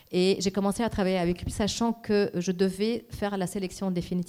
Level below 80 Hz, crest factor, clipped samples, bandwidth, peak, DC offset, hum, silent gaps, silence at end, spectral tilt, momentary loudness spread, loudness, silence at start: -48 dBFS; 14 dB; under 0.1%; 15 kHz; -14 dBFS; under 0.1%; none; none; 0 s; -5.5 dB/octave; 6 LU; -28 LUFS; 0.1 s